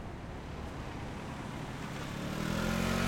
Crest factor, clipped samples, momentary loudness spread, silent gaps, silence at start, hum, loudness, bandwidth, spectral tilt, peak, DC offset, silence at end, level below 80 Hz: 18 dB; under 0.1%; 10 LU; none; 0 s; none; -38 LUFS; 16.5 kHz; -5 dB/octave; -20 dBFS; under 0.1%; 0 s; -48 dBFS